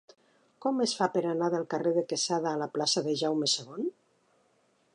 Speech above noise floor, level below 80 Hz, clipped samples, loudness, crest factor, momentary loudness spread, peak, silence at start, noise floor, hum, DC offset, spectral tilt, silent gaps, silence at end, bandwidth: 40 dB; -84 dBFS; under 0.1%; -29 LUFS; 18 dB; 6 LU; -12 dBFS; 0.6 s; -69 dBFS; none; under 0.1%; -3.5 dB/octave; none; 1.05 s; 11 kHz